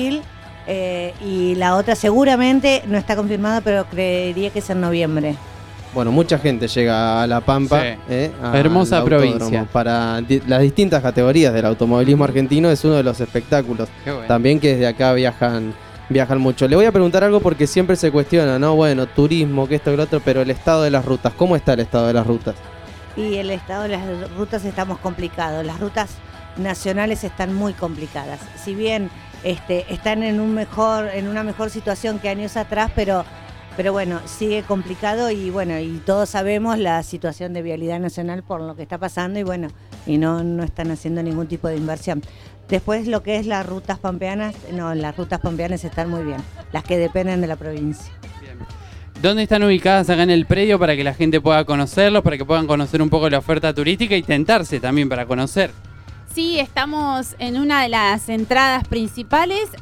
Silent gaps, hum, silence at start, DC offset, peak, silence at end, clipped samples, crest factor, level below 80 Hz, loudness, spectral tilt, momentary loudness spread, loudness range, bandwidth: none; none; 0 s; under 0.1%; -2 dBFS; 0 s; under 0.1%; 16 dB; -40 dBFS; -18 LUFS; -6 dB/octave; 13 LU; 8 LU; 15.5 kHz